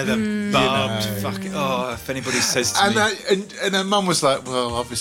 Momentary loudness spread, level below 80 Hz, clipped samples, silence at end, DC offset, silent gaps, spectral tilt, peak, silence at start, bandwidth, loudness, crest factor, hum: 7 LU; -50 dBFS; under 0.1%; 0 s; under 0.1%; none; -3.5 dB/octave; -6 dBFS; 0 s; 17 kHz; -20 LUFS; 16 dB; none